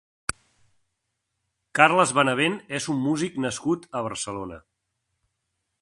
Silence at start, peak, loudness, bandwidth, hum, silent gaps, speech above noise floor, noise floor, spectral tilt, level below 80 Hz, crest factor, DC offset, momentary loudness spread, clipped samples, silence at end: 1.75 s; 0 dBFS; -24 LUFS; 11.5 kHz; none; none; 55 dB; -79 dBFS; -4 dB/octave; -60 dBFS; 26 dB; under 0.1%; 15 LU; under 0.1%; 1.25 s